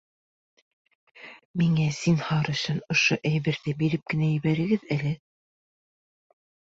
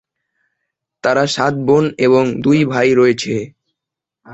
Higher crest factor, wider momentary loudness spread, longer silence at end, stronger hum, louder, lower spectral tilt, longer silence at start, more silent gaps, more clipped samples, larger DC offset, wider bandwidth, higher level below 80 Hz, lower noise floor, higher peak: about the same, 18 dB vs 14 dB; about the same, 9 LU vs 9 LU; first, 1.6 s vs 0 s; neither; second, -25 LUFS vs -14 LUFS; about the same, -5.5 dB/octave vs -6 dB/octave; about the same, 1.15 s vs 1.05 s; first, 1.45-1.54 s vs none; neither; neither; about the same, 7.8 kHz vs 8.2 kHz; second, -60 dBFS vs -54 dBFS; first, under -90 dBFS vs -83 dBFS; second, -10 dBFS vs -2 dBFS